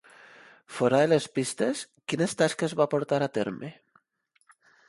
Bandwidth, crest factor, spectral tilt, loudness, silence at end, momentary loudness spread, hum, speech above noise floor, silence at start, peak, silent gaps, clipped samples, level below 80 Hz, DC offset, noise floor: 11.5 kHz; 20 dB; -5 dB/octave; -27 LUFS; 1.15 s; 11 LU; none; 45 dB; 0.7 s; -8 dBFS; none; under 0.1%; -70 dBFS; under 0.1%; -72 dBFS